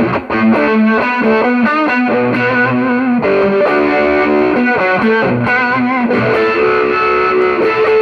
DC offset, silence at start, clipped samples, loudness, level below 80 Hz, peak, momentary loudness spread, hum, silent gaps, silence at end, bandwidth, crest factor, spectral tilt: under 0.1%; 0 s; under 0.1%; -12 LUFS; -44 dBFS; 0 dBFS; 2 LU; none; none; 0 s; 6.6 kHz; 10 dB; -7.5 dB/octave